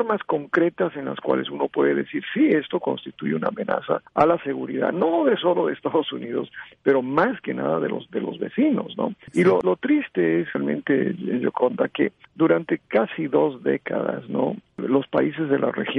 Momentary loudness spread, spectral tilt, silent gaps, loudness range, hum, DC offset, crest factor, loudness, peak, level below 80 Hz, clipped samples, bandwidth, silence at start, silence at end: 8 LU; -8 dB/octave; none; 1 LU; none; under 0.1%; 16 dB; -23 LUFS; -6 dBFS; -64 dBFS; under 0.1%; 11 kHz; 0 s; 0 s